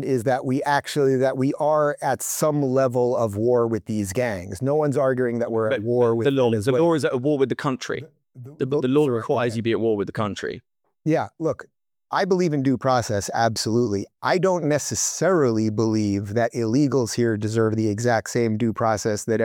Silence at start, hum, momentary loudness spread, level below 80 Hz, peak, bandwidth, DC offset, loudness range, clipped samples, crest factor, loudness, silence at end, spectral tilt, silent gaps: 0 s; none; 6 LU; -60 dBFS; -6 dBFS; 18 kHz; under 0.1%; 3 LU; under 0.1%; 16 dB; -22 LUFS; 0 s; -5.5 dB/octave; none